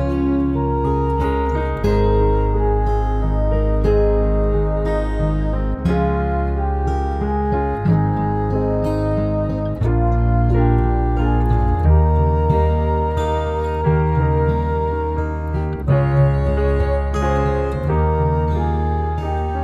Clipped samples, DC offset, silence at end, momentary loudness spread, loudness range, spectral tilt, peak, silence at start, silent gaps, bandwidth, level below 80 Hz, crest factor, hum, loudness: under 0.1%; under 0.1%; 0 s; 5 LU; 2 LU; -9.5 dB/octave; -4 dBFS; 0 s; none; 7.4 kHz; -22 dBFS; 14 dB; none; -19 LUFS